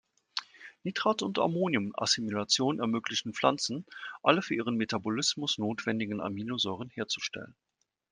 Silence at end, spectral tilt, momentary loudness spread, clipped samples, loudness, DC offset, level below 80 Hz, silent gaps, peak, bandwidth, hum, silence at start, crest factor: 0.6 s; -3.5 dB/octave; 11 LU; under 0.1%; -31 LUFS; under 0.1%; -74 dBFS; none; -6 dBFS; 10.5 kHz; none; 0.35 s; 24 dB